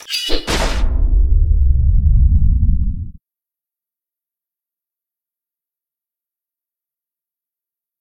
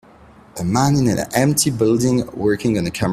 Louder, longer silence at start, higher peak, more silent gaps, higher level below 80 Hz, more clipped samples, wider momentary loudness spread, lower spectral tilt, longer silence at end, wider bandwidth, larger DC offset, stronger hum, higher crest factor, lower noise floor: about the same, -17 LUFS vs -18 LUFS; second, 0.1 s vs 0.55 s; about the same, 0 dBFS vs 0 dBFS; neither; first, -18 dBFS vs -44 dBFS; neither; about the same, 7 LU vs 5 LU; about the same, -5 dB/octave vs -5.5 dB/octave; first, 4.9 s vs 0 s; second, 13 kHz vs 16 kHz; neither; neither; about the same, 16 dB vs 18 dB; first, -89 dBFS vs -46 dBFS